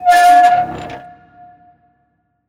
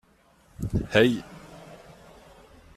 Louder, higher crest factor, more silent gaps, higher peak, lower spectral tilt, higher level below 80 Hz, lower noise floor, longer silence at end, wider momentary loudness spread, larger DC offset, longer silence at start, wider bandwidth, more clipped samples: first, -10 LUFS vs -25 LUFS; second, 14 dB vs 26 dB; neither; first, 0 dBFS vs -4 dBFS; second, -3 dB/octave vs -6 dB/octave; second, -52 dBFS vs -46 dBFS; first, -64 dBFS vs -60 dBFS; first, 1.5 s vs 1 s; second, 23 LU vs 26 LU; neither; second, 0 s vs 0.6 s; first, 16 kHz vs 14.5 kHz; neither